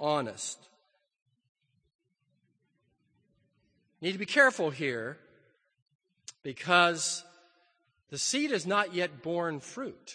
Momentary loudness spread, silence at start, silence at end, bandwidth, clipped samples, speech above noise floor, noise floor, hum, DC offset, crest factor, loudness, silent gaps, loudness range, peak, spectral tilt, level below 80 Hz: 19 LU; 0 s; 0 s; 9.8 kHz; under 0.1%; 46 dB; -76 dBFS; none; under 0.1%; 26 dB; -29 LUFS; 1.22-1.26 s, 1.49-1.55 s, 1.95-1.99 s, 5.82-5.86 s, 5.95-5.99 s; 11 LU; -8 dBFS; -3 dB/octave; -82 dBFS